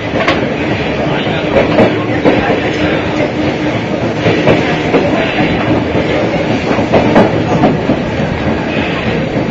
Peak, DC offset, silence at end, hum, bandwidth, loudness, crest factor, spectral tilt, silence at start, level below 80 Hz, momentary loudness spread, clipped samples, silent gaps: 0 dBFS; under 0.1%; 0 s; none; 7.8 kHz; -12 LUFS; 12 dB; -6.5 dB/octave; 0 s; -32 dBFS; 5 LU; 0.2%; none